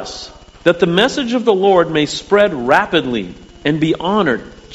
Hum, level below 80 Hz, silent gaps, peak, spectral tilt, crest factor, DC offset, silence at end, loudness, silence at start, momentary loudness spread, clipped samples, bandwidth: none; -44 dBFS; none; 0 dBFS; -5 dB/octave; 16 dB; under 0.1%; 0 s; -15 LUFS; 0 s; 11 LU; under 0.1%; 9.8 kHz